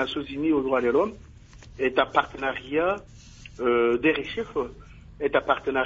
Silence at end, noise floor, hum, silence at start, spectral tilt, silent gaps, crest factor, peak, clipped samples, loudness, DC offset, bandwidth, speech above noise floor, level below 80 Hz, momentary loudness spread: 0 s; -47 dBFS; none; 0 s; -6 dB/octave; none; 20 dB; -6 dBFS; under 0.1%; -25 LUFS; under 0.1%; 7.8 kHz; 22 dB; -50 dBFS; 9 LU